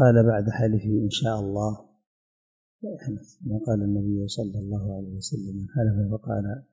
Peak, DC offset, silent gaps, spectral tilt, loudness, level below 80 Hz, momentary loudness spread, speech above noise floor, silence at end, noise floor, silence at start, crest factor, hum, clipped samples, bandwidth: -6 dBFS; under 0.1%; 2.07-2.79 s; -7 dB/octave; -27 LUFS; -48 dBFS; 12 LU; over 65 dB; 0.1 s; under -90 dBFS; 0 s; 18 dB; none; under 0.1%; 7.8 kHz